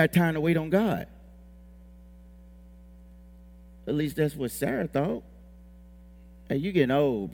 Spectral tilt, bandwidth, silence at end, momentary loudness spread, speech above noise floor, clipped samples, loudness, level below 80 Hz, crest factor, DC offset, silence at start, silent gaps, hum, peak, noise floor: -7 dB/octave; 18 kHz; 0 s; 10 LU; 24 dB; under 0.1%; -27 LUFS; -52 dBFS; 22 dB; under 0.1%; 0 s; none; none; -8 dBFS; -50 dBFS